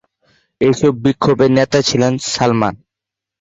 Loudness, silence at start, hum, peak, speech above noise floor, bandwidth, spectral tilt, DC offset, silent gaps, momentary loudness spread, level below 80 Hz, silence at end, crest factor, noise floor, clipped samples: -14 LUFS; 0.6 s; none; -2 dBFS; 70 dB; 8 kHz; -5.5 dB/octave; under 0.1%; none; 5 LU; -46 dBFS; 0.65 s; 14 dB; -84 dBFS; under 0.1%